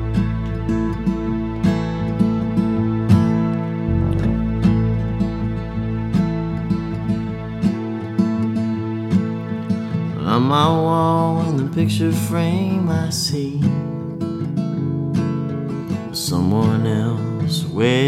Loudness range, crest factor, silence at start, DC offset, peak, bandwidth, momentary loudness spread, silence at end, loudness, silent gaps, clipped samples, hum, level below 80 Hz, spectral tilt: 4 LU; 16 dB; 0 s; under 0.1%; -2 dBFS; 15 kHz; 7 LU; 0 s; -20 LUFS; none; under 0.1%; none; -34 dBFS; -7 dB/octave